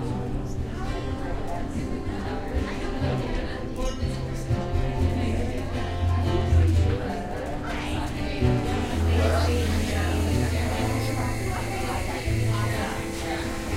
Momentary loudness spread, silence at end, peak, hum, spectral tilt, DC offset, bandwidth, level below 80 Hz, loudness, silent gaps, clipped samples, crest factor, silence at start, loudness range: 8 LU; 0 s; -10 dBFS; none; -6 dB/octave; under 0.1%; 15.5 kHz; -32 dBFS; -27 LUFS; none; under 0.1%; 16 dB; 0 s; 5 LU